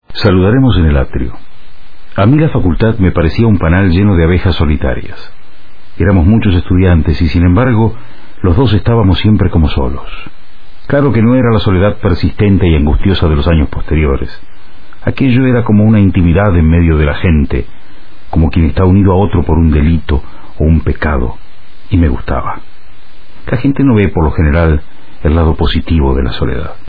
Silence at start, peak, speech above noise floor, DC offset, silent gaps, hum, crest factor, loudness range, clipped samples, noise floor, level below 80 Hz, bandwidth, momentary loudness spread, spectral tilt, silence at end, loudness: 0 s; 0 dBFS; 31 dB; 10%; none; none; 12 dB; 3 LU; under 0.1%; -40 dBFS; -18 dBFS; 5 kHz; 9 LU; -10.5 dB/octave; 0 s; -11 LUFS